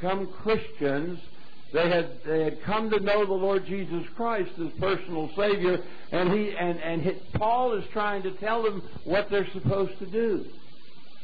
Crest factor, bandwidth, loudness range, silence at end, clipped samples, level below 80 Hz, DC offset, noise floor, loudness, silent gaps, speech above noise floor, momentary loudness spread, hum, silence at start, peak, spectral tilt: 14 dB; 5 kHz; 1 LU; 0.65 s; under 0.1%; -54 dBFS; 3%; -54 dBFS; -28 LUFS; none; 26 dB; 7 LU; none; 0 s; -14 dBFS; -8.5 dB/octave